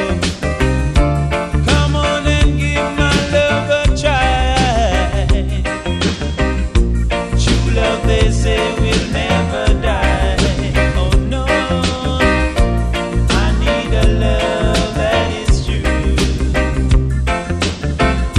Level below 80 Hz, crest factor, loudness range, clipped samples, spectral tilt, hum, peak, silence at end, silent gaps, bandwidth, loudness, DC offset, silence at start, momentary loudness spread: -18 dBFS; 14 dB; 2 LU; under 0.1%; -5.5 dB/octave; none; 0 dBFS; 0 s; none; 11.5 kHz; -15 LUFS; under 0.1%; 0 s; 4 LU